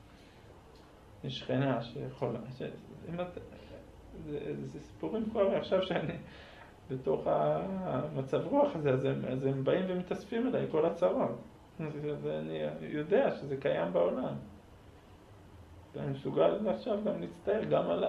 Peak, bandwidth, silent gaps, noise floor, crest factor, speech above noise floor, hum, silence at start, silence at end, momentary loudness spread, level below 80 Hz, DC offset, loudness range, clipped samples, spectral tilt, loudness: -16 dBFS; 10.5 kHz; none; -56 dBFS; 18 dB; 23 dB; none; 0 s; 0 s; 16 LU; -60 dBFS; under 0.1%; 6 LU; under 0.1%; -8 dB/octave; -34 LUFS